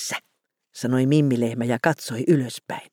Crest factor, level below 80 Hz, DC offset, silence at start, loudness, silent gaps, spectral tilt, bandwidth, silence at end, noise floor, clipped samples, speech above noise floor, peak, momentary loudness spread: 18 dB; -72 dBFS; under 0.1%; 0 s; -23 LUFS; none; -6 dB/octave; 18 kHz; 0.1 s; -73 dBFS; under 0.1%; 51 dB; -4 dBFS; 12 LU